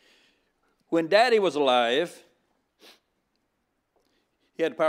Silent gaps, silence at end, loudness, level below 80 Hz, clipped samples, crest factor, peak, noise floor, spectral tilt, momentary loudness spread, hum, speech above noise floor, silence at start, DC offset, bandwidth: none; 0 s; -23 LUFS; -84 dBFS; under 0.1%; 22 dB; -6 dBFS; -76 dBFS; -4 dB/octave; 10 LU; none; 53 dB; 0.9 s; under 0.1%; 15 kHz